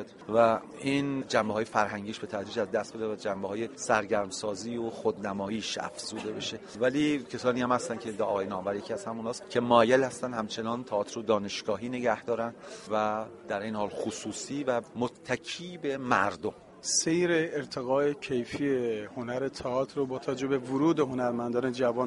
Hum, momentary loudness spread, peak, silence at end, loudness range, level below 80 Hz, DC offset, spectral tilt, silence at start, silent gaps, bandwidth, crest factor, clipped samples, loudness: none; 9 LU; -6 dBFS; 0 s; 4 LU; -66 dBFS; under 0.1%; -4 dB/octave; 0 s; none; 11.5 kHz; 24 dB; under 0.1%; -30 LUFS